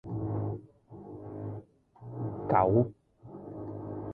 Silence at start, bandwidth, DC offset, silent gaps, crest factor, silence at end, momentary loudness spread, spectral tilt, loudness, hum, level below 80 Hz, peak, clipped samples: 0.05 s; 3.6 kHz; under 0.1%; none; 22 dB; 0 s; 23 LU; -12.5 dB/octave; -32 LUFS; none; -56 dBFS; -10 dBFS; under 0.1%